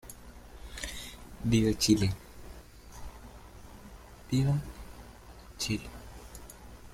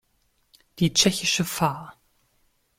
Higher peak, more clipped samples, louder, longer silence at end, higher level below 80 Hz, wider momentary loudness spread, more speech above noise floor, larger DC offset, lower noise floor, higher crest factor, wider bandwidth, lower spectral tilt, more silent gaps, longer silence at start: second, -12 dBFS vs -4 dBFS; neither; second, -31 LUFS vs -22 LUFS; second, 0 s vs 0.85 s; first, -48 dBFS vs -56 dBFS; first, 25 LU vs 7 LU; second, 23 dB vs 45 dB; neither; second, -50 dBFS vs -68 dBFS; about the same, 22 dB vs 24 dB; about the same, 16.5 kHz vs 16.5 kHz; first, -5 dB/octave vs -3 dB/octave; neither; second, 0.05 s vs 0.75 s